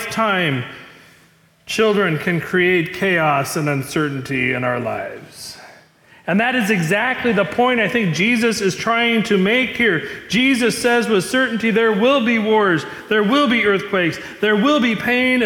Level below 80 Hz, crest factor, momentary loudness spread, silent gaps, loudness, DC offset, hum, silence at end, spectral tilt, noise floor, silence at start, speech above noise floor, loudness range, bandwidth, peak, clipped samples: -56 dBFS; 12 dB; 7 LU; none; -17 LUFS; under 0.1%; none; 0 s; -5 dB/octave; -53 dBFS; 0 s; 36 dB; 4 LU; 18 kHz; -6 dBFS; under 0.1%